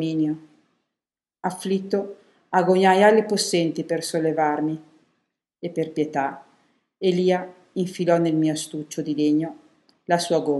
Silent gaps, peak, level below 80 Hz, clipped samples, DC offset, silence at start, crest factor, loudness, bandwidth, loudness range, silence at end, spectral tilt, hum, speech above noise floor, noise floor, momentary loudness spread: none; -4 dBFS; -76 dBFS; under 0.1%; under 0.1%; 0 s; 20 dB; -23 LUFS; 12.5 kHz; 6 LU; 0 s; -5 dB/octave; none; 68 dB; -90 dBFS; 14 LU